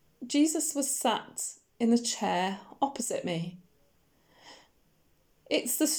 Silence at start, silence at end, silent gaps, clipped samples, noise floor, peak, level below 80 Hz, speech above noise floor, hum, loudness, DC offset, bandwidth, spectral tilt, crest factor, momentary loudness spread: 0.2 s; 0 s; none; under 0.1%; -68 dBFS; -12 dBFS; -76 dBFS; 39 dB; none; -30 LUFS; under 0.1%; over 20 kHz; -3 dB/octave; 18 dB; 9 LU